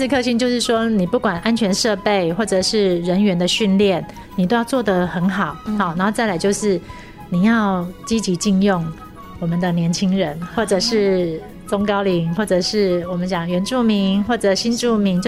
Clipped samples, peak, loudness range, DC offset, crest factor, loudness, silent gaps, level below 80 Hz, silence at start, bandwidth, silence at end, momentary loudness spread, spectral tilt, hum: under 0.1%; -2 dBFS; 2 LU; under 0.1%; 16 dB; -18 LUFS; none; -44 dBFS; 0 s; 14 kHz; 0 s; 7 LU; -5 dB/octave; none